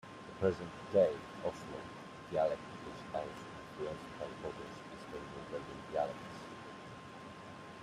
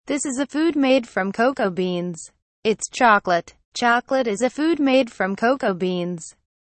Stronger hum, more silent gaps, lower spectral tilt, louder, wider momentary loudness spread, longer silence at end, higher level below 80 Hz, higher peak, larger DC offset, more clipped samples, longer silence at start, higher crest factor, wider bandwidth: neither; second, none vs 2.42-2.63 s, 3.65-3.72 s; first, -6 dB/octave vs -4.5 dB/octave; second, -40 LUFS vs -21 LUFS; first, 16 LU vs 11 LU; second, 0 s vs 0.35 s; second, -68 dBFS vs -62 dBFS; second, -18 dBFS vs -4 dBFS; neither; neither; about the same, 0.05 s vs 0.05 s; about the same, 22 dB vs 18 dB; first, 13 kHz vs 8.8 kHz